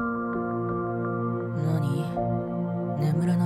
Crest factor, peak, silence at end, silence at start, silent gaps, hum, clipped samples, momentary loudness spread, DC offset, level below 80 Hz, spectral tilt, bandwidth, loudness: 12 dB; -14 dBFS; 0 s; 0 s; none; none; under 0.1%; 4 LU; under 0.1%; -54 dBFS; -9 dB/octave; 13 kHz; -28 LUFS